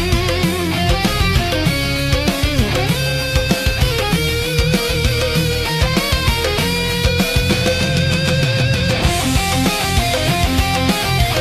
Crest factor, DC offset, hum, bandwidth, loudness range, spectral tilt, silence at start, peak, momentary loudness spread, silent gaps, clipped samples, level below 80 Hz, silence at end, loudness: 14 dB; under 0.1%; none; 16 kHz; 1 LU; -4.5 dB/octave; 0 s; -2 dBFS; 1 LU; none; under 0.1%; -24 dBFS; 0 s; -16 LUFS